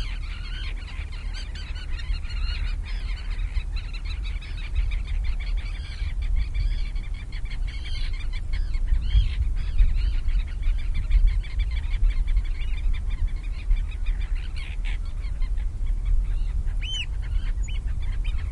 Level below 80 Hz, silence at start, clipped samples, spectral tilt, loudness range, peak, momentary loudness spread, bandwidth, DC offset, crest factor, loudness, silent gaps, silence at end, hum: -24 dBFS; 0 s; under 0.1%; -5 dB/octave; 5 LU; -8 dBFS; 8 LU; 7.4 kHz; under 0.1%; 16 dB; -30 LUFS; none; 0 s; none